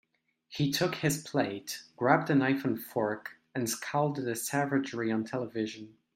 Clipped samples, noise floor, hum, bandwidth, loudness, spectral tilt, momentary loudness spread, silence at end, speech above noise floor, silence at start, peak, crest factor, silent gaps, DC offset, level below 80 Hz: under 0.1%; -65 dBFS; none; 16 kHz; -31 LUFS; -5 dB/octave; 11 LU; 0.25 s; 34 dB; 0.5 s; -8 dBFS; 22 dB; none; under 0.1%; -70 dBFS